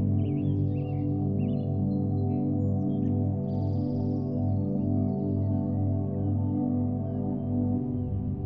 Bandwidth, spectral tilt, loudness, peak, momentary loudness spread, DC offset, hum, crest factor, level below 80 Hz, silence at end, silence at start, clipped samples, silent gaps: 3.1 kHz; -12.5 dB/octave; -28 LUFS; -16 dBFS; 2 LU; under 0.1%; 50 Hz at -35 dBFS; 12 dB; -50 dBFS; 0 s; 0 s; under 0.1%; none